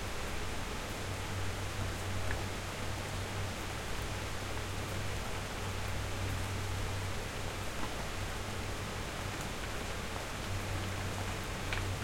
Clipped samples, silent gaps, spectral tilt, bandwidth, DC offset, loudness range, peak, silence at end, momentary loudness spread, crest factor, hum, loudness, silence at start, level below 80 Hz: under 0.1%; none; -4 dB/octave; 16.5 kHz; under 0.1%; 1 LU; -18 dBFS; 0 s; 2 LU; 20 dB; none; -39 LUFS; 0 s; -46 dBFS